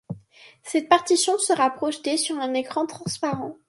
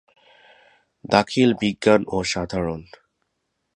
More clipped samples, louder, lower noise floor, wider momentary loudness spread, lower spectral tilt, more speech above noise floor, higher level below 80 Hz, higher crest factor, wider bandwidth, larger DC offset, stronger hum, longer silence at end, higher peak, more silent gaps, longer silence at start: neither; about the same, -23 LUFS vs -21 LUFS; second, -51 dBFS vs -75 dBFS; about the same, 9 LU vs 9 LU; second, -3 dB/octave vs -5 dB/octave; second, 28 dB vs 55 dB; second, -68 dBFS vs -50 dBFS; about the same, 22 dB vs 22 dB; about the same, 11.5 kHz vs 10.5 kHz; neither; neither; second, 0.15 s vs 0.95 s; about the same, -2 dBFS vs 0 dBFS; neither; second, 0.1 s vs 1.05 s